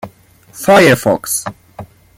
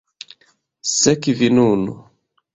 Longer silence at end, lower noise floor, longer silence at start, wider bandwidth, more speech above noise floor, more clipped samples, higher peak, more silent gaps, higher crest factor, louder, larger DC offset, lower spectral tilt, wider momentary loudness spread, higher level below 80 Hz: second, 0.35 s vs 0.55 s; second, -39 dBFS vs -60 dBFS; second, 0.05 s vs 0.85 s; first, 16.5 kHz vs 8.4 kHz; second, 28 dB vs 44 dB; neither; about the same, 0 dBFS vs -2 dBFS; neither; about the same, 14 dB vs 18 dB; first, -11 LUFS vs -17 LUFS; neither; about the same, -4 dB/octave vs -4 dB/octave; second, 12 LU vs 24 LU; first, -48 dBFS vs -54 dBFS